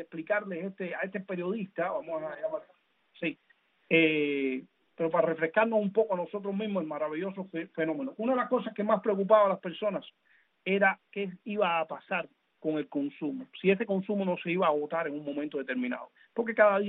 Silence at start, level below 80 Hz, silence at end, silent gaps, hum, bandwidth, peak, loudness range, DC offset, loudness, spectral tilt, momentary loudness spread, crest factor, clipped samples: 0 s; -80 dBFS; 0 s; none; none; 4 kHz; -10 dBFS; 3 LU; under 0.1%; -30 LUFS; -4 dB/octave; 12 LU; 20 dB; under 0.1%